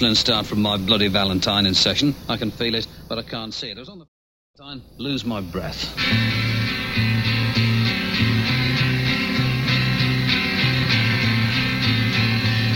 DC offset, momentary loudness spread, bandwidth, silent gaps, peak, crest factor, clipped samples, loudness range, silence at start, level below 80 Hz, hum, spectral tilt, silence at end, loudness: under 0.1%; 11 LU; 16.5 kHz; 4.08-4.54 s; -4 dBFS; 18 dB; under 0.1%; 9 LU; 0 s; -42 dBFS; none; -5 dB/octave; 0 s; -20 LUFS